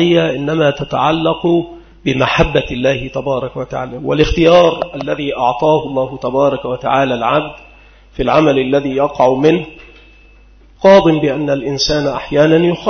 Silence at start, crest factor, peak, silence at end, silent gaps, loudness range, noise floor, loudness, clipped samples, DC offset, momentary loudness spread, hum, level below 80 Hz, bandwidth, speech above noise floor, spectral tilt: 0 s; 14 dB; 0 dBFS; 0 s; none; 2 LU; -43 dBFS; -14 LUFS; under 0.1%; under 0.1%; 11 LU; none; -34 dBFS; 6.6 kHz; 30 dB; -6 dB/octave